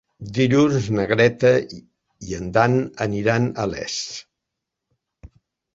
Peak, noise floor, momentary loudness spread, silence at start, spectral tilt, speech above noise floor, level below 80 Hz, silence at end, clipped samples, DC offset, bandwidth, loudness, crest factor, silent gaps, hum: -2 dBFS; -82 dBFS; 16 LU; 0.2 s; -6 dB/octave; 62 dB; -50 dBFS; 0.5 s; under 0.1%; under 0.1%; 7.8 kHz; -20 LUFS; 20 dB; none; none